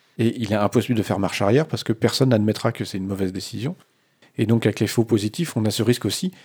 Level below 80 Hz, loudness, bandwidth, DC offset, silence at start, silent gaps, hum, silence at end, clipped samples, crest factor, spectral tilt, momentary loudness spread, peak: -66 dBFS; -22 LUFS; over 20 kHz; under 0.1%; 0.2 s; none; none; 0.15 s; under 0.1%; 18 dB; -6 dB/octave; 9 LU; -4 dBFS